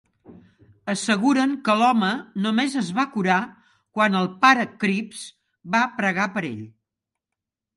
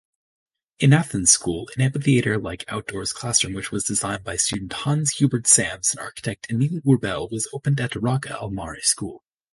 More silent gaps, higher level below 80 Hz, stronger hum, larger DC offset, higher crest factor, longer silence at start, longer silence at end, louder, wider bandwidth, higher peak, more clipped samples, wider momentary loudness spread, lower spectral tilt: neither; second, -70 dBFS vs -50 dBFS; neither; neither; about the same, 20 dB vs 20 dB; second, 0.3 s vs 0.8 s; first, 1.1 s vs 0.35 s; about the same, -22 LUFS vs -21 LUFS; about the same, 11.5 kHz vs 11.5 kHz; about the same, -2 dBFS vs -2 dBFS; neither; first, 16 LU vs 12 LU; about the same, -4.5 dB/octave vs -4 dB/octave